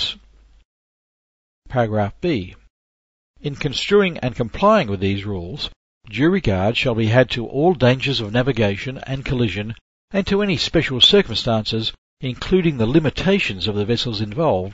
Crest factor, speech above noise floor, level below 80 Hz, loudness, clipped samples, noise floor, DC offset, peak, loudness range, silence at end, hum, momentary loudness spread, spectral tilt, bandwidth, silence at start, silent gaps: 20 dB; 31 dB; -40 dBFS; -19 LUFS; under 0.1%; -49 dBFS; under 0.1%; 0 dBFS; 5 LU; 0 s; none; 12 LU; -6 dB/octave; 8 kHz; 0 s; 0.65-1.62 s, 2.70-3.34 s, 5.76-6.01 s, 9.81-10.08 s, 11.98-12.17 s